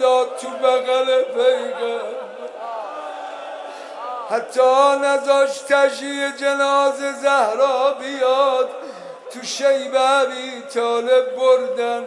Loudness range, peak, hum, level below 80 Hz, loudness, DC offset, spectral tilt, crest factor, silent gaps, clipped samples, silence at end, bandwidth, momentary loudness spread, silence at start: 5 LU; -2 dBFS; none; -88 dBFS; -18 LUFS; under 0.1%; -1.5 dB/octave; 16 dB; none; under 0.1%; 0 s; 11.5 kHz; 15 LU; 0 s